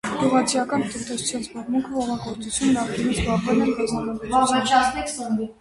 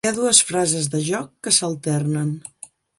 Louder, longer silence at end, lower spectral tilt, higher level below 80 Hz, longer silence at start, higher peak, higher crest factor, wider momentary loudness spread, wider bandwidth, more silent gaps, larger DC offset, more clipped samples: second, -23 LUFS vs -19 LUFS; second, 0.1 s vs 0.3 s; about the same, -4 dB/octave vs -3 dB/octave; first, -44 dBFS vs -62 dBFS; about the same, 0.05 s vs 0.05 s; second, -6 dBFS vs 0 dBFS; about the same, 18 dB vs 22 dB; second, 8 LU vs 12 LU; about the same, 11.5 kHz vs 11.5 kHz; neither; neither; neither